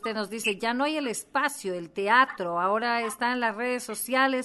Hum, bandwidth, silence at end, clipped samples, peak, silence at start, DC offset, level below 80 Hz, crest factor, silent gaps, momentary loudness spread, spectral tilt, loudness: none; 12.5 kHz; 0 s; under 0.1%; -8 dBFS; 0.05 s; under 0.1%; -72 dBFS; 18 dB; none; 9 LU; -3 dB/octave; -27 LUFS